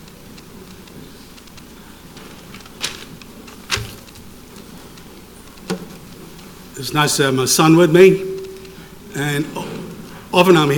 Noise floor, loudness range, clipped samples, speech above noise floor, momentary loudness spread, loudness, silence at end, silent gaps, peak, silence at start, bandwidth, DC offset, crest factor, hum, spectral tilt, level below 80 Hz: -39 dBFS; 18 LU; under 0.1%; 26 dB; 27 LU; -16 LUFS; 0 s; none; 0 dBFS; 0.55 s; 19 kHz; under 0.1%; 20 dB; none; -4.5 dB/octave; -48 dBFS